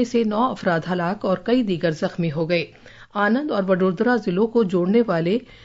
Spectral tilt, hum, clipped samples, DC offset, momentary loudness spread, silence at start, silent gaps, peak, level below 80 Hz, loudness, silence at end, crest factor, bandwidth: -7 dB/octave; none; under 0.1%; under 0.1%; 5 LU; 0 s; none; -6 dBFS; -56 dBFS; -21 LUFS; 0.1 s; 14 dB; 7.8 kHz